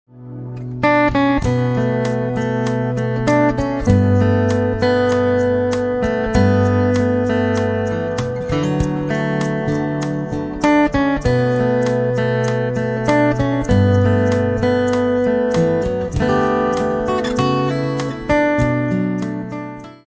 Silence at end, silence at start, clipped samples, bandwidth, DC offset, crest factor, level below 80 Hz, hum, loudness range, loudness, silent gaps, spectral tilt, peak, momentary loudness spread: 0.15 s; 0.15 s; under 0.1%; 8 kHz; under 0.1%; 16 dB; -34 dBFS; none; 3 LU; -17 LUFS; none; -7.5 dB/octave; -2 dBFS; 7 LU